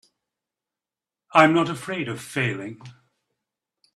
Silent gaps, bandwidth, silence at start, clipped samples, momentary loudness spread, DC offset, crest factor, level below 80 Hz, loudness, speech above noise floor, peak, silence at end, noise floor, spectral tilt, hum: none; 13.5 kHz; 1.35 s; under 0.1%; 14 LU; under 0.1%; 24 dB; -66 dBFS; -22 LUFS; over 68 dB; 0 dBFS; 1.05 s; under -90 dBFS; -5.5 dB/octave; none